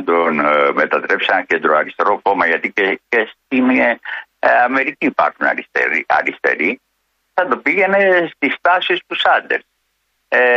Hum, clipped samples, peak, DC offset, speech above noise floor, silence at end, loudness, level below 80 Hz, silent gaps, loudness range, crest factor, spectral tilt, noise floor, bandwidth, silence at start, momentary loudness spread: none; under 0.1%; -2 dBFS; under 0.1%; 52 dB; 0 s; -15 LUFS; -64 dBFS; none; 1 LU; 14 dB; -5.5 dB/octave; -67 dBFS; 7.6 kHz; 0 s; 5 LU